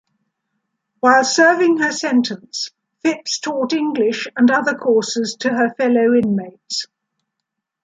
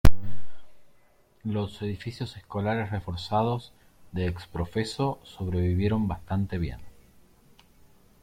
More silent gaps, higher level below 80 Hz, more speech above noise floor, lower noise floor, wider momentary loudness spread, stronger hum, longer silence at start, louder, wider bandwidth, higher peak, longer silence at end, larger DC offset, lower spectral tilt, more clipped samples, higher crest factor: neither; second, -66 dBFS vs -38 dBFS; first, 63 dB vs 31 dB; first, -79 dBFS vs -60 dBFS; about the same, 12 LU vs 12 LU; neither; first, 1.05 s vs 0.05 s; first, -17 LUFS vs -30 LUFS; second, 9.4 kHz vs 16.5 kHz; about the same, -2 dBFS vs -4 dBFS; second, 1 s vs 1.35 s; neither; second, -3.5 dB/octave vs -7 dB/octave; neither; second, 16 dB vs 22 dB